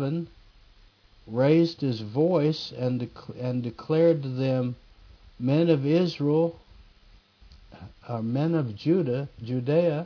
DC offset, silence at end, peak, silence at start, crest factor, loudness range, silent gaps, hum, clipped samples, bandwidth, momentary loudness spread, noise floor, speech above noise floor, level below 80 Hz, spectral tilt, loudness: under 0.1%; 0 s; -10 dBFS; 0 s; 18 dB; 3 LU; none; none; under 0.1%; 5.4 kHz; 11 LU; -56 dBFS; 31 dB; -58 dBFS; -8.5 dB/octave; -26 LUFS